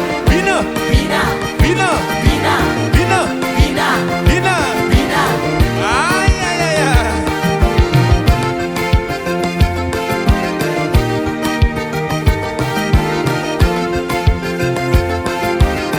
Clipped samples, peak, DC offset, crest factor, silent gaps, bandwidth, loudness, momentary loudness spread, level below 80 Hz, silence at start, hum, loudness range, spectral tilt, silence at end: under 0.1%; 0 dBFS; under 0.1%; 14 dB; none; over 20 kHz; -15 LUFS; 5 LU; -20 dBFS; 0 s; none; 2 LU; -5.5 dB/octave; 0 s